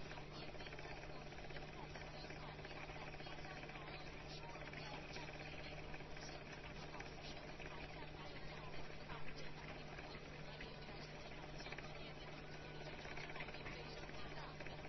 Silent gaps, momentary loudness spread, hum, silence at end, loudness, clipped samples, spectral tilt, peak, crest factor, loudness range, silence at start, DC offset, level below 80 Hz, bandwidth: none; 3 LU; none; 0 s; -52 LUFS; under 0.1%; -3.5 dB/octave; -36 dBFS; 16 dB; 1 LU; 0 s; under 0.1%; -60 dBFS; 6 kHz